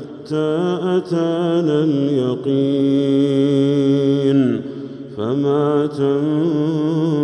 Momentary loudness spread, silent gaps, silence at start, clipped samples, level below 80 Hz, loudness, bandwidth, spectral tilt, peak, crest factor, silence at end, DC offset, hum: 6 LU; none; 0 s; under 0.1%; -64 dBFS; -17 LUFS; 8.6 kHz; -8.5 dB/octave; -6 dBFS; 12 dB; 0 s; under 0.1%; none